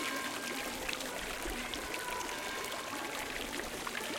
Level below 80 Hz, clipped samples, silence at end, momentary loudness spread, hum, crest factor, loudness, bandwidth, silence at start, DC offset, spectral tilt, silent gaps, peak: -56 dBFS; under 0.1%; 0 s; 1 LU; none; 22 dB; -38 LUFS; 17 kHz; 0 s; under 0.1%; -1.5 dB/octave; none; -18 dBFS